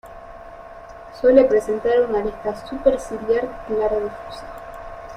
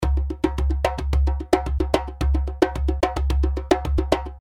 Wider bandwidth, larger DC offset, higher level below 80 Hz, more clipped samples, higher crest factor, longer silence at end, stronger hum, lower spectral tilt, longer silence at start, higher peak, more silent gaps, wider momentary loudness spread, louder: about the same, 12 kHz vs 12 kHz; neither; second, -44 dBFS vs -24 dBFS; neither; about the same, 18 dB vs 18 dB; about the same, 0 s vs 0 s; neither; about the same, -6 dB/octave vs -7 dB/octave; about the same, 0.05 s vs 0 s; about the same, -2 dBFS vs -2 dBFS; neither; first, 24 LU vs 2 LU; first, -20 LUFS vs -23 LUFS